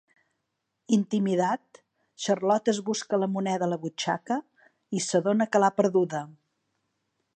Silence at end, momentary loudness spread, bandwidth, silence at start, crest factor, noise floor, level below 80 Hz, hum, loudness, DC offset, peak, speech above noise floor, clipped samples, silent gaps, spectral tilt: 1.05 s; 9 LU; 9.4 kHz; 0.9 s; 20 dB; -81 dBFS; -80 dBFS; none; -27 LUFS; under 0.1%; -8 dBFS; 55 dB; under 0.1%; none; -5 dB/octave